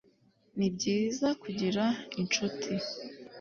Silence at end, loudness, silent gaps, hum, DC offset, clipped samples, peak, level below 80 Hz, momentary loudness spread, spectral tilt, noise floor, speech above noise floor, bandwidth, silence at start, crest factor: 0 s; -32 LUFS; none; none; under 0.1%; under 0.1%; -16 dBFS; -68 dBFS; 10 LU; -4.5 dB/octave; -66 dBFS; 35 dB; 7.4 kHz; 0.55 s; 16 dB